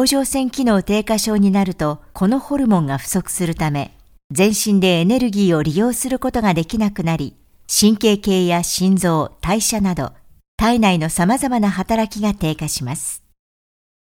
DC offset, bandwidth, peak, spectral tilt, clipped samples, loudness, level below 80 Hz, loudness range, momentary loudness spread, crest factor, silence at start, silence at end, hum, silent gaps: under 0.1%; 17 kHz; 0 dBFS; -5 dB/octave; under 0.1%; -17 LUFS; -40 dBFS; 2 LU; 8 LU; 16 dB; 0 s; 1 s; none; 4.24-4.30 s, 10.48-10.58 s